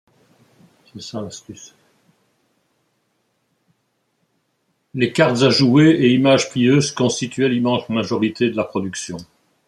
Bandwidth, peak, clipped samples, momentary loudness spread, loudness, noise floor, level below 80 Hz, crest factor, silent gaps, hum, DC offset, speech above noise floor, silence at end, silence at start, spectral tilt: 12 kHz; -2 dBFS; under 0.1%; 20 LU; -17 LUFS; -69 dBFS; -60 dBFS; 18 dB; none; none; under 0.1%; 52 dB; 0.45 s; 0.95 s; -5.5 dB/octave